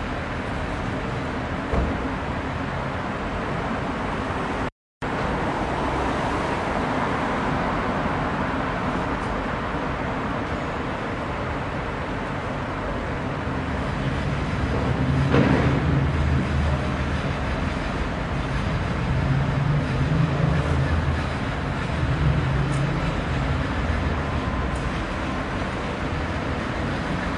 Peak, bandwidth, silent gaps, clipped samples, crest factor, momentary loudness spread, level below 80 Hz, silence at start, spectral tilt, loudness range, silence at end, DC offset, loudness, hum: -6 dBFS; 11 kHz; 4.72-5.01 s; under 0.1%; 18 dB; 6 LU; -32 dBFS; 0 s; -7 dB/octave; 5 LU; 0 s; under 0.1%; -25 LUFS; none